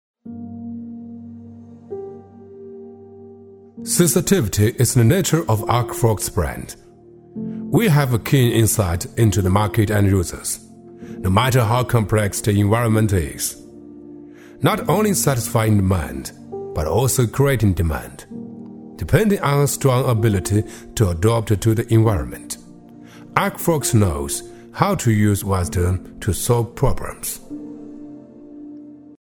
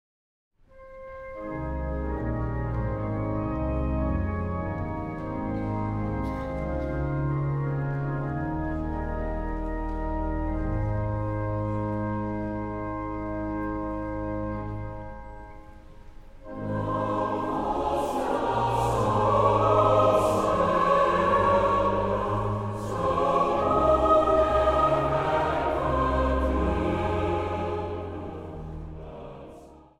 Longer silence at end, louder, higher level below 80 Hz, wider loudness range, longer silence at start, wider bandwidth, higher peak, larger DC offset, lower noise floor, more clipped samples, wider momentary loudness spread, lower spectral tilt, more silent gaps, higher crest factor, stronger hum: first, 0.35 s vs 0.2 s; first, -19 LUFS vs -27 LUFS; about the same, -36 dBFS vs -36 dBFS; second, 4 LU vs 10 LU; second, 0.25 s vs 0.75 s; first, 18 kHz vs 14 kHz; first, 0 dBFS vs -8 dBFS; neither; about the same, -45 dBFS vs -48 dBFS; neither; first, 21 LU vs 15 LU; second, -5.5 dB/octave vs -7.5 dB/octave; neither; about the same, 20 dB vs 18 dB; neither